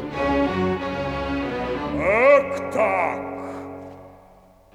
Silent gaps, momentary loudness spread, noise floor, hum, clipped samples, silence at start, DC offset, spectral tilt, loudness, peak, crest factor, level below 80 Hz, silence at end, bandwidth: none; 18 LU; -51 dBFS; none; under 0.1%; 0 s; under 0.1%; -6.5 dB/octave; -22 LUFS; -4 dBFS; 20 dB; -44 dBFS; 0.6 s; 11 kHz